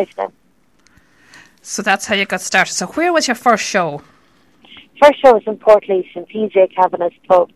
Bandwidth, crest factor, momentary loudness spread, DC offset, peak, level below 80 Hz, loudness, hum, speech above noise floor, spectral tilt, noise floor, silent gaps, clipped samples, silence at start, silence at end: 14 kHz; 16 dB; 11 LU; 0.1%; 0 dBFS; -56 dBFS; -14 LUFS; none; 42 dB; -3 dB/octave; -56 dBFS; none; under 0.1%; 0 s; 0.1 s